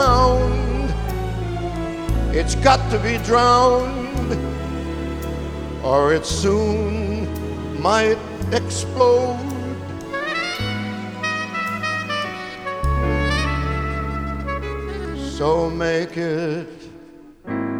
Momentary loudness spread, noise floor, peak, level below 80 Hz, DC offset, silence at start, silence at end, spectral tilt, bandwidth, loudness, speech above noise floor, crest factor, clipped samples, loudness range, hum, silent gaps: 12 LU; -43 dBFS; 0 dBFS; -28 dBFS; under 0.1%; 0 s; 0 s; -5.5 dB/octave; 17 kHz; -21 LUFS; 25 dB; 20 dB; under 0.1%; 5 LU; none; none